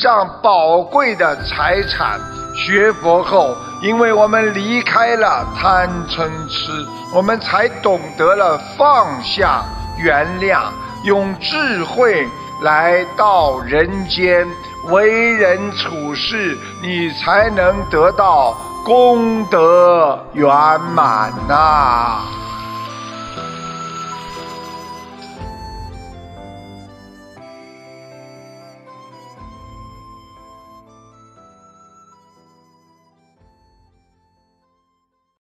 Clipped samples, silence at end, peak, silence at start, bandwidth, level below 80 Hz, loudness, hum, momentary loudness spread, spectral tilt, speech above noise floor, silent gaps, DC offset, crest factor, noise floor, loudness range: under 0.1%; 5.25 s; 0 dBFS; 0 s; 13.5 kHz; -38 dBFS; -14 LUFS; none; 16 LU; -5 dB/octave; 54 dB; none; under 0.1%; 16 dB; -68 dBFS; 16 LU